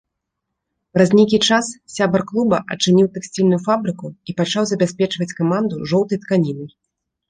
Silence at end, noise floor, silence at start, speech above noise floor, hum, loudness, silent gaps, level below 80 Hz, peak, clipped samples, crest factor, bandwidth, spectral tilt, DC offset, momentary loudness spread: 0.6 s; -79 dBFS; 0.95 s; 61 dB; none; -18 LUFS; none; -56 dBFS; -2 dBFS; under 0.1%; 16 dB; 10 kHz; -5.5 dB/octave; under 0.1%; 10 LU